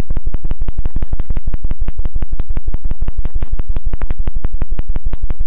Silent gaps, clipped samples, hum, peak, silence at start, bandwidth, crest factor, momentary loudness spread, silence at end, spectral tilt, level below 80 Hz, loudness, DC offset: none; under 0.1%; none; -2 dBFS; 0 s; 1.8 kHz; 6 dB; 1 LU; 0 s; -8.5 dB/octave; -16 dBFS; -26 LUFS; 6%